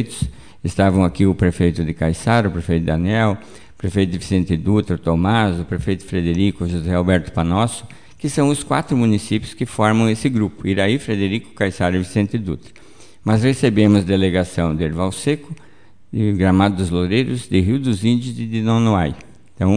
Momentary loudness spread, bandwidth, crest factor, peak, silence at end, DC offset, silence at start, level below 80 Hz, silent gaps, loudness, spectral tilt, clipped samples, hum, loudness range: 9 LU; 10 kHz; 16 dB; -2 dBFS; 0 s; 0.8%; 0 s; -38 dBFS; none; -18 LUFS; -6.5 dB/octave; under 0.1%; none; 2 LU